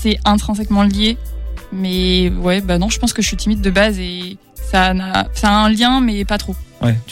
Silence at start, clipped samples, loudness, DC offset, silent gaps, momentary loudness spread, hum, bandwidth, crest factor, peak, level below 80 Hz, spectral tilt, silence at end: 0 s; under 0.1%; -15 LUFS; under 0.1%; none; 13 LU; none; 16.5 kHz; 14 dB; -2 dBFS; -24 dBFS; -4.5 dB/octave; 0 s